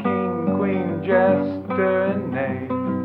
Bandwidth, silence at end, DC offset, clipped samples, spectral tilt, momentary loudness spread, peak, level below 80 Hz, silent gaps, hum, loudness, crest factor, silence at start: 4.6 kHz; 0 s; under 0.1%; under 0.1%; -10.5 dB/octave; 7 LU; -6 dBFS; -70 dBFS; none; none; -22 LUFS; 16 dB; 0 s